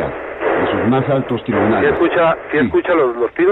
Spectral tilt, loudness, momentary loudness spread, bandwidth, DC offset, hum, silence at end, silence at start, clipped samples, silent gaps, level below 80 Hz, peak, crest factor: -9 dB/octave; -16 LUFS; 5 LU; 4.1 kHz; under 0.1%; none; 0 s; 0 s; under 0.1%; none; -44 dBFS; -2 dBFS; 12 dB